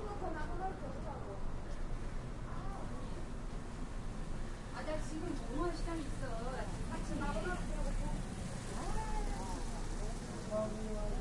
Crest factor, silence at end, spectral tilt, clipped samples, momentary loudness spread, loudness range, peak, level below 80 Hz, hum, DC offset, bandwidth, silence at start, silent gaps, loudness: 14 dB; 0 s; -5.5 dB/octave; under 0.1%; 7 LU; 5 LU; -26 dBFS; -42 dBFS; none; under 0.1%; 11.5 kHz; 0 s; none; -43 LUFS